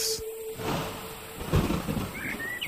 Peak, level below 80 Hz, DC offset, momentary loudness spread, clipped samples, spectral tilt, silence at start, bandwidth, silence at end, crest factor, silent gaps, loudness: -12 dBFS; -42 dBFS; under 0.1%; 11 LU; under 0.1%; -4 dB/octave; 0 s; 16 kHz; 0 s; 18 dB; none; -31 LUFS